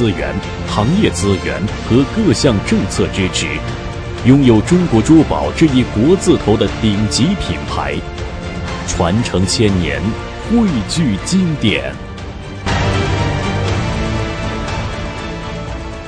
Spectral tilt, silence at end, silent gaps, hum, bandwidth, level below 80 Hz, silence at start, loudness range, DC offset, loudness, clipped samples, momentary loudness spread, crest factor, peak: -5.5 dB/octave; 0 s; none; none; 10.5 kHz; -28 dBFS; 0 s; 6 LU; under 0.1%; -15 LUFS; under 0.1%; 13 LU; 14 dB; 0 dBFS